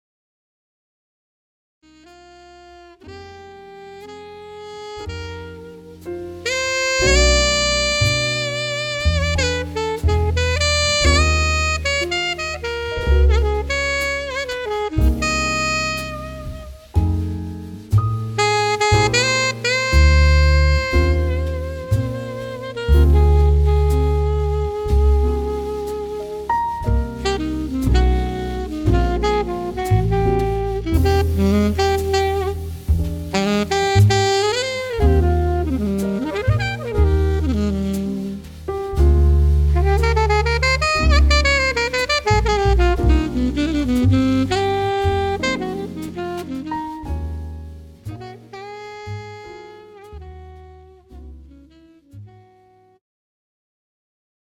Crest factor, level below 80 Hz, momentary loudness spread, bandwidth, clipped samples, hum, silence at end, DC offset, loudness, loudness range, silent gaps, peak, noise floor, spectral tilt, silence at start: 18 dB; -22 dBFS; 18 LU; 14.5 kHz; under 0.1%; none; 2.3 s; under 0.1%; -18 LUFS; 14 LU; none; -2 dBFS; -53 dBFS; -5 dB/octave; 2.65 s